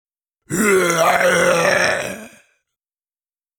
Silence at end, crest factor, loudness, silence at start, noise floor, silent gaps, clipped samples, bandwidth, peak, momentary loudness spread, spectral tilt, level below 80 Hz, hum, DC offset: 1.3 s; 16 dB; -16 LUFS; 0.5 s; under -90 dBFS; none; under 0.1%; over 20 kHz; -2 dBFS; 12 LU; -3 dB/octave; -54 dBFS; none; under 0.1%